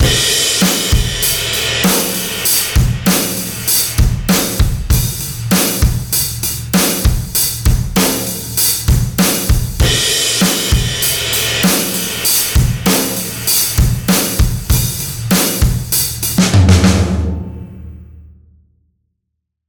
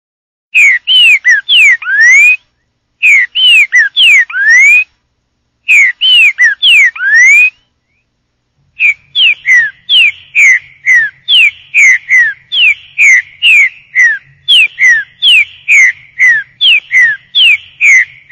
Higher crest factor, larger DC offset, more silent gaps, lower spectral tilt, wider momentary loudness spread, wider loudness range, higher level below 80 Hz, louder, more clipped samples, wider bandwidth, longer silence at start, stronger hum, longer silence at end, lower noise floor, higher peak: first, 14 dB vs 8 dB; neither; neither; first, -3.5 dB/octave vs 4.5 dB/octave; about the same, 6 LU vs 5 LU; about the same, 2 LU vs 2 LU; first, -20 dBFS vs -62 dBFS; second, -13 LUFS vs -4 LUFS; neither; first, 19.5 kHz vs 16.5 kHz; second, 0 s vs 0.55 s; neither; first, 1.45 s vs 0.25 s; first, -74 dBFS vs -62 dBFS; about the same, 0 dBFS vs 0 dBFS